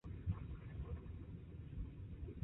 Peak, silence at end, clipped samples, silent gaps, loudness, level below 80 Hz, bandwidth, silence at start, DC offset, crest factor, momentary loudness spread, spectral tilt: -28 dBFS; 0 s; under 0.1%; none; -50 LUFS; -52 dBFS; 3.9 kHz; 0.05 s; under 0.1%; 18 dB; 7 LU; -9.5 dB/octave